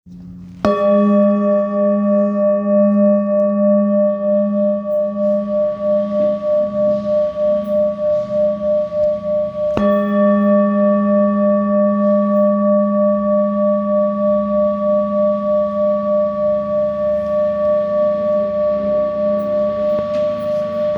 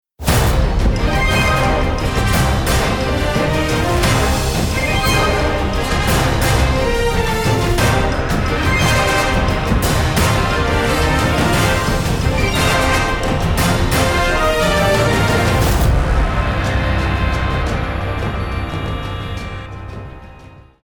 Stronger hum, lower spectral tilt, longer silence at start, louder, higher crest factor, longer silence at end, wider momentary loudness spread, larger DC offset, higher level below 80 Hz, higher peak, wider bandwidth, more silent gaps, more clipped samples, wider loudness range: neither; first, -10 dB/octave vs -5 dB/octave; second, 0.05 s vs 0.2 s; about the same, -16 LUFS vs -16 LUFS; about the same, 16 dB vs 14 dB; second, 0 s vs 0.3 s; about the same, 5 LU vs 7 LU; neither; second, -50 dBFS vs -22 dBFS; about the same, 0 dBFS vs -2 dBFS; second, 5.8 kHz vs over 20 kHz; neither; neither; about the same, 3 LU vs 4 LU